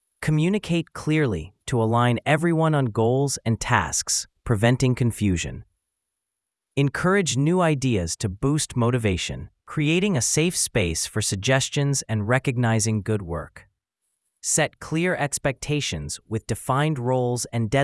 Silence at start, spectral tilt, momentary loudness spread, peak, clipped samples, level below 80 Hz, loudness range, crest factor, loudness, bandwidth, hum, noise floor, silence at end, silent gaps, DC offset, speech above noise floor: 0.2 s; -4.5 dB/octave; 7 LU; -2 dBFS; under 0.1%; -46 dBFS; 3 LU; 22 dB; -23 LUFS; 12 kHz; none; -83 dBFS; 0 s; none; under 0.1%; 61 dB